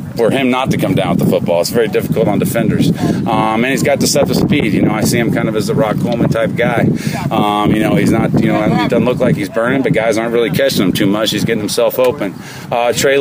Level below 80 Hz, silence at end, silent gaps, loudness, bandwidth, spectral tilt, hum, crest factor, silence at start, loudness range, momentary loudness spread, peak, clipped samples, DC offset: -42 dBFS; 0 s; none; -13 LUFS; 16 kHz; -5.5 dB/octave; none; 10 dB; 0 s; 1 LU; 3 LU; -2 dBFS; under 0.1%; under 0.1%